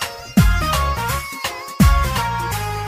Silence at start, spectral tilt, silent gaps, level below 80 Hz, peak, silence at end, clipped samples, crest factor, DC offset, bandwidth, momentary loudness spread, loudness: 0 s; -5 dB/octave; none; -22 dBFS; -2 dBFS; 0 s; under 0.1%; 16 dB; under 0.1%; 16 kHz; 9 LU; -19 LUFS